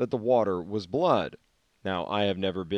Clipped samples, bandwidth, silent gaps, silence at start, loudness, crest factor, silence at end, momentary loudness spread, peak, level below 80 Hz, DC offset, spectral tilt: under 0.1%; 9.2 kHz; none; 0 s; -27 LUFS; 18 dB; 0 s; 8 LU; -10 dBFS; -66 dBFS; under 0.1%; -7 dB/octave